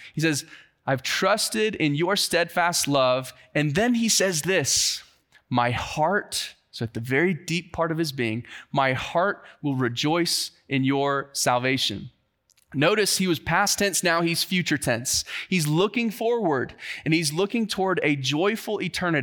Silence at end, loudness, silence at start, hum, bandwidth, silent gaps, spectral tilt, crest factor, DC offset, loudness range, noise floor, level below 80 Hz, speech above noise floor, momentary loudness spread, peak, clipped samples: 0 s; -24 LUFS; 0 s; none; 19 kHz; none; -3.5 dB/octave; 18 dB; under 0.1%; 3 LU; -65 dBFS; -58 dBFS; 41 dB; 8 LU; -6 dBFS; under 0.1%